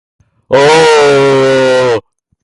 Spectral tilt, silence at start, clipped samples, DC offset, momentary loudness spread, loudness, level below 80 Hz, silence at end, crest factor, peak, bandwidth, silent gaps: -4 dB/octave; 0.5 s; under 0.1%; under 0.1%; 8 LU; -8 LUFS; -48 dBFS; 0.45 s; 8 dB; 0 dBFS; 11.5 kHz; none